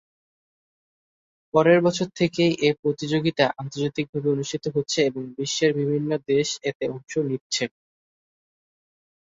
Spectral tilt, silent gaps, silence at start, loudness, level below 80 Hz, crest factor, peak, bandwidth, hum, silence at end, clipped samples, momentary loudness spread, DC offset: -5 dB/octave; 2.79-2.83 s, 4.09-4.13 s, 6.75-6.80 s, 7.41-7.50 s; 1.55 s; -24 LUFS; -64 dBFS; 20 dB; -4 dBFS; 8 kHz; none; 1.6 s; under 0.1%; 8 LU; under 0.1%